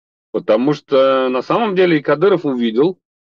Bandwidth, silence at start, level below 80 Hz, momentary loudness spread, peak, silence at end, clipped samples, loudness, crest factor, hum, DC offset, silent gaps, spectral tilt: 6.8 kHz; 0.35 s; -68 dBFS; 4 LU; -4 dBFS; 0.4 s; under 0.1%; -15 LUFS; 12 dB; none; under 0.1%; none; -7.5 dB/octave